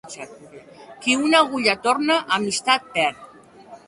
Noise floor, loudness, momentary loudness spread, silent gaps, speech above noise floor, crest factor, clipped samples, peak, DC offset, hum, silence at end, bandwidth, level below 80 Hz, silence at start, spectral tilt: -45 dBFS; -20 LUFS; 14 LU; none; 24 dB; 20 dB; under 0.1%; -2 dBFS; under 0.1%; none; 0.1 s; 11.5 kHz; -64 dBFS; 0.05 s; -2.5 dB/octave